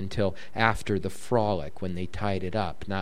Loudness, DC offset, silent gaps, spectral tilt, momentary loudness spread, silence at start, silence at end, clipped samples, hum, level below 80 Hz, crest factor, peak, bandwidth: -29 LUFS; 2%; none; -6 dB/octave; 7 LU; 0 s; 0 s; under 0.1%; none; -48 dBFS; 24 dB; -4 dBFS; 14 kHz